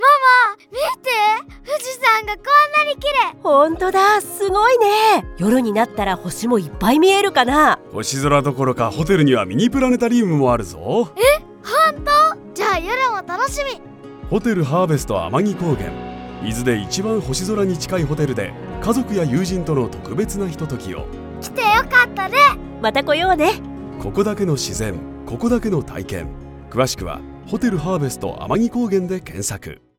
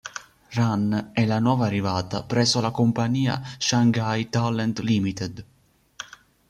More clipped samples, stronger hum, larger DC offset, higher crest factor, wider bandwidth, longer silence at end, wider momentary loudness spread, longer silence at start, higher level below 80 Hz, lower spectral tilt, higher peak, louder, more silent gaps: neither; neither; neither; about the same, 16 dB vs 16 dB; first, 19 kHz vs 11.5 kHz; second, 0.25 s vs 0.45 s; second, 13 LU vs 17 LU; about the same, 0 s vs 0.05 s; first, -38 dBFS vs -56 dBFS; about the same, -5 dB/octave vs -5.5 dB/octave; first, -2 dBFS vs -8 dBFS; first, -17 LUFS vs -23 LUFS; neither